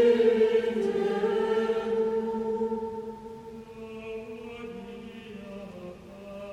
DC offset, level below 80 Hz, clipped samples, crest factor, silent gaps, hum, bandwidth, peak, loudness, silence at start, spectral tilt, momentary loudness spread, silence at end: under 0.1%; -60 dBFS; under 0.1%; 18 dB; none; none; 9.2 kHz; -12 dBFS; -27 LUFS; 0 s; -6.5 dB/octave; 19 LU; 0 s